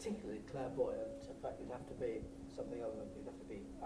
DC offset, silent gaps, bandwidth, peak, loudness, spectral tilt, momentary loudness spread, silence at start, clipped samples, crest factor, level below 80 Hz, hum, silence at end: under 0.1%; none; 13 kHz; -26 dBFS; -46 LUFS; -6.5 dB/octave; 10 LU; 0 s; under 0.1%; 18 dB; -60 dBFS; none; 0 s